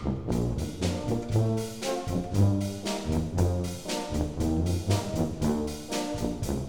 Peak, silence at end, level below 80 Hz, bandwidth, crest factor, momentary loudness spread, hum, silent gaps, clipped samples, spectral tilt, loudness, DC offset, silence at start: -10 dBFS; 0 s; -40 dBFS; 18.5 kHz; 18 dB; 6 LU; none; none; under 0.1%; -6 dB/octave; -29 LUFS; 0.3%; 0 s